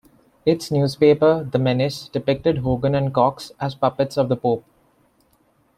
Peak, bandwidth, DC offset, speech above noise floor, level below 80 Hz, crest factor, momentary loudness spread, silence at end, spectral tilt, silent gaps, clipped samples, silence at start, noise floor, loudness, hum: -4 dBFS; 14.5 kHz; under 0.1%; 42 dB; -50 dBFS; 18 dB; 8 LU; 1.15 s; -7 dB/octave; none; under 0.1%; 0.45 s; -61 dBFS; -20 LUFS; none